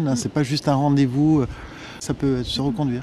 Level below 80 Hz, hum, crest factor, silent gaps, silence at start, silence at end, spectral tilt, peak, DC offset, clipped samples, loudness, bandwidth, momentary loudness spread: -42 dBFS; none; 14 dB; none; 0 s; 0 s; -6 dB/octave; -8 dBFS; under 0.1%; under 0.1%; -21 LUFS; 12.5 kHz; 12 LU